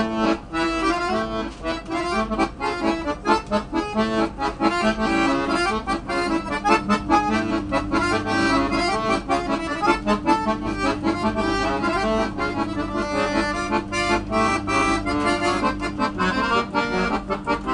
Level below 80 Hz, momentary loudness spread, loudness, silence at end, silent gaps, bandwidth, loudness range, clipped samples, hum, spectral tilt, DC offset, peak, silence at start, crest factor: -38 dBFS; 5 LU; -22 LUFS; 0 s; none; 10.5 kHz; 2 LU; under 0.1%; none; -5 dB/octave; under 0.1%; -4 dBFS; 0 s; 18 dB